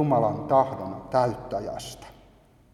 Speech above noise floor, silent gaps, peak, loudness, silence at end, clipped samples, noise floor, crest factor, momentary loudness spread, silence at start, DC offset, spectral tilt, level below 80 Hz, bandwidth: 31 dB; none; -8 dBFS; -26 LUFS; 0.6 s; under 0.1%; -56 dBFS; 18 dB; 15 LU; 0 s; under 0.1%; -7 dB/octave; -54 dBFS; 13.5 kHz